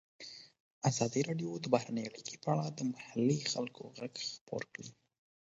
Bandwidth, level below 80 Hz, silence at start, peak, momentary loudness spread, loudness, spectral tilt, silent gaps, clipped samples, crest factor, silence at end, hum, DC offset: 8 kHz; -76 dBFS; 0.2 s; -12 dBFS; 17 LU; -37 LUFS; -5.5 dB/octave; 0.60-0.81 s, 4.41-4.47 s; under 0.1%; 26 dB; 0.55 s; none; under 0.1%